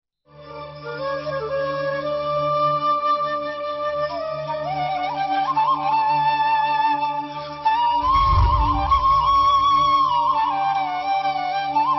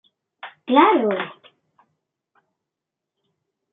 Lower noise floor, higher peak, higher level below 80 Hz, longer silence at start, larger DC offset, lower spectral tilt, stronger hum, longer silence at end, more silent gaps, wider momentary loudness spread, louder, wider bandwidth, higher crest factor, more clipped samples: second, -44 dBFS vs -85 dBFS; second, -8 dBFS vs -2 dBFS; first, -34 dBFS vs -76 dBFS; about the same, 0.35 s vs 0.45 s; neither; first, -6.5 dB/octave vs -2.5 dB/octave; neither; second, 0 s vs 2.4 s; neither; second, 10 LU vs 25 LU; about the same, -20 LUFS vs -18 LUFS; first, 6 kHz vs 4.1 kHz; second, 12 dB vs 22 dB; neither